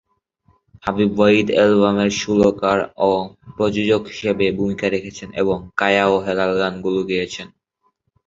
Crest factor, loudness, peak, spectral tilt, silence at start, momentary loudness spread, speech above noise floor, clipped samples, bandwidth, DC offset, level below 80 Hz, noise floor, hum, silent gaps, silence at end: 18 dB; -18 LUFS; -2 dBFS; -5.5 dB/octave; 0.85 s; 11 LU; 50 dB; under 0.1%; 7.8 kHz; under 0.1%; -48 dBFS; -68 dBFS; none; none; 0.8 s